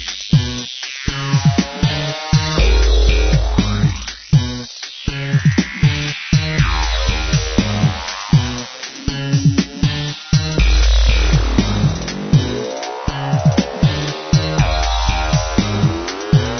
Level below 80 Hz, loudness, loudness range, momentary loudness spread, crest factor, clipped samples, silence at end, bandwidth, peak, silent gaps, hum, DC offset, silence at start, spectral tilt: -20 dBFS; -17 LUFS; 1 LU; 9 LU; 16 dB; under 0.1%; 0 s; 6.6 kHz; 0 dBFS; none; none; under 0.1%; 0 s; -5.5 dB/octave